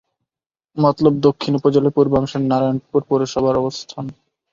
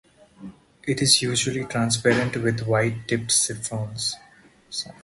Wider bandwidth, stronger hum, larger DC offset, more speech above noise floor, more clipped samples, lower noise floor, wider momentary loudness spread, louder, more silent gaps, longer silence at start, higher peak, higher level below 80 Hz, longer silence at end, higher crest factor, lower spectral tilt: second, 7.6 kHz vs 12 kHz; neither; neither; first, 72 dB vs 29 dB; neither; first, -89 dBFS vs -52 dBFS; about the same, 14 LU vs 14 LU; first, -17 LUFS vs -22 LUFS; neither; first, 0.75 s vs 0.4 s; about the same, -2 dBFS vs -2 dBFS; first, -50 dBFS vs -56 dBFS; first, 0.4 s vs 0.1 s; second, 16 dB vs 22 dB; first, -7.5 dB/octave vs -3 dB/octave